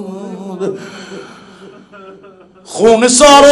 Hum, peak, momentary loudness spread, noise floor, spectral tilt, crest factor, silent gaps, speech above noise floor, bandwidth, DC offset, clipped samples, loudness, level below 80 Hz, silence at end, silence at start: none; 0 dBFS; 25 LU; -40 dBFS; -2.5 dB/octave; 12 dB; none; 33 dB; 16 kHz; under 0.1%; 1%; -9 LUFS; -42 dBFS; 0 s; 0 s